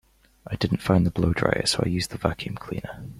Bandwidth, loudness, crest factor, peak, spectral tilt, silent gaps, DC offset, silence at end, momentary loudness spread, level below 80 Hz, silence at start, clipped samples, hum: 15 kHz; -25 LUFS; 22 dB; -4 dBFS; -5.5 dB/octave; none; under 0.1%; 0 s; 12 LU; -44 dBFS; 0.45 s; under 0.1%; none